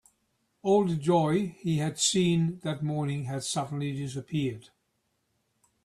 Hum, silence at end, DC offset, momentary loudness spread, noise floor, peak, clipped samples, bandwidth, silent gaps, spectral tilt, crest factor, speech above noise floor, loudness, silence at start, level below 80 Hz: none; 1.25 s; under 0.1%; 9 LU; -76 dBFS; -12 dBFS; under 0.1%; 13 kHz; none; -5 dB/octave; 18 dB; 49 dB; -28 LUFS; 0.65 s; -64 dBFS